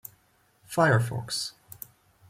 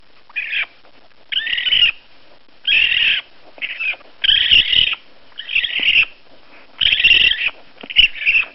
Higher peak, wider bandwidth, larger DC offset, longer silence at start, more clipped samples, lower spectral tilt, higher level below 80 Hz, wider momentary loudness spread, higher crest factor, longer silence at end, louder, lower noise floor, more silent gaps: second, -10 dBFS vs 0 dBFS; first, 16.5 kHz vs 6 kHz; second, under 0.1% vs 0.8%; first, 0.7 s vs 0.35 s; neither; first, -5 dB/octave vs 4 dB/octave; second, -62 dBFS vs -44 dBFS; first, 22 LU vs 14 LU; about the same, 20 dB vs 18 dB; first, 0.8 s vs 0 s; second, -27 LUFS vs -14 LUFS; first, -65 dBFS vs -50 dBFS; neither